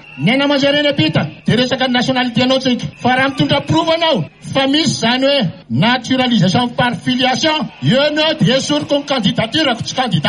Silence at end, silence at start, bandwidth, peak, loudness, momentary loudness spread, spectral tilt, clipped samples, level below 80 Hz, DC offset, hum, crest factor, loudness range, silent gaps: 0 s; 0.05 s; 10.5 kHz; -2 dBFS; -14 LUFS; 4 LU; -5 dB/octave; under 0.1%; -50 dBFS; under 0.1%; none; 12 dB; 1 LU; none